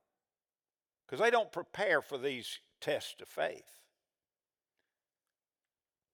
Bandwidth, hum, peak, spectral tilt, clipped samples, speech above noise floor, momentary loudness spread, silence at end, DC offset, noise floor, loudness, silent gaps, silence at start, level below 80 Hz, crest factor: over 20 kHz; none; -18 dBFS; -3 dB/octave; under 0.1%; over 55 dB; 14 LU; 2.5 s; under 0.1%; under -90 dBFS; -35 LUFS; none; 1.1 s; -88 dBFS; 22 dB